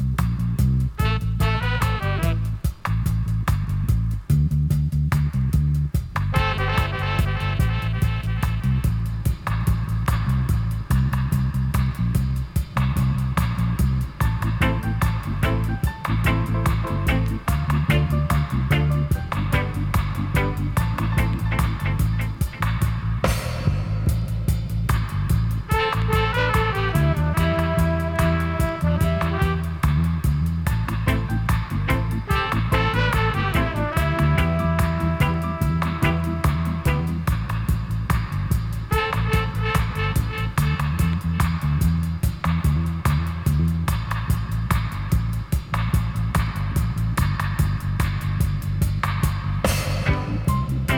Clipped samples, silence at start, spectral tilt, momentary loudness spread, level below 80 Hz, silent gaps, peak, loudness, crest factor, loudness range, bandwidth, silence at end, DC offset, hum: under 0.1%; 0 s; -6.5 dB/octave; 4 LU; -28 dBFS; none; -4 dBFS; -23 LUFS; 16 dB; 2 LU; 18 kHz; 0 s; under 0.1%; none